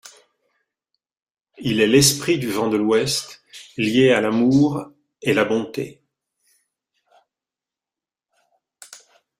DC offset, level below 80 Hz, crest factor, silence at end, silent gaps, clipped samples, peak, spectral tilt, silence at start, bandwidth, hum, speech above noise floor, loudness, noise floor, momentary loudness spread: under 0.1%; -56 dBFS; 22 dB; 0.45 s; none; under 0.1%; -2 dBFS; -4 dB/octave; 0.05 s; 16 kHz; none; 72 dB; -19 LUFS; -90 dBFS; 17 LU